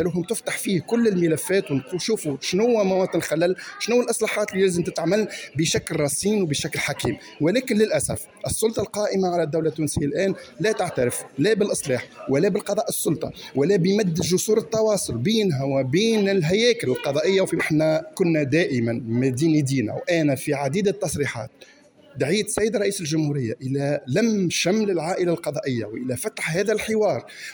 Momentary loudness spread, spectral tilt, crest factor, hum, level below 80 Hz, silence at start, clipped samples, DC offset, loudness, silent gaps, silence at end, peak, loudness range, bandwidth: 6 LU; -5 dB/octave; 16 dB; none; -54 dBFS; 0 s; under 0.1%; under 0.1%; -22 LUFS; none; 0 s; -8 dBFS; 3 LU; over 20 kHz